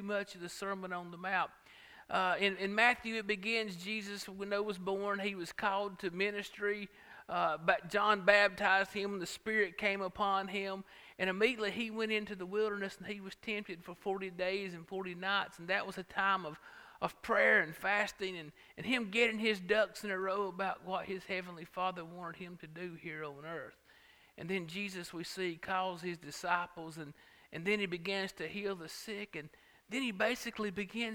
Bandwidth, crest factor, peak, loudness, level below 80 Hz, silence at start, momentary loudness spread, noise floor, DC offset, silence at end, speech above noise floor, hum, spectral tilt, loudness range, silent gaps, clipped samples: 18.5 kHz; 26 dB; -10 dBFS; -35 LUFS; -72 dBFS; 0 s; 15 LU; -64 dBFS; under 0.1%; 0 s; 27 dB; none; -4 dB/octave; 9 LU; none; under 0.1%